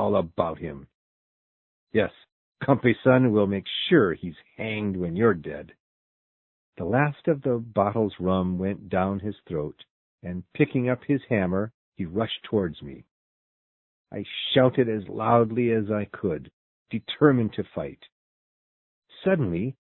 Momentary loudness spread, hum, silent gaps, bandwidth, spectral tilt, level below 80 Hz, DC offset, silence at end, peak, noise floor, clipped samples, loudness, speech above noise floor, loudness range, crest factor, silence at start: 15 LU; none; 0.94-1.87 s, 2.32-2.52 s, 5.80-6.73 s, 9.90-10.18 s, 11.74-11.92 s, 13.11-14.05 s, 16.53-16.86 s, 18.12-19.02 s; 4.2 kHz; -11 dB/octave; -52 dBFS; under 0.1%; 0.25 s; -4 dBFS; under -90 dBFS; under 0.1%; -25 LUFS; over 65 dB; 5 LU; 22 dB; 0 s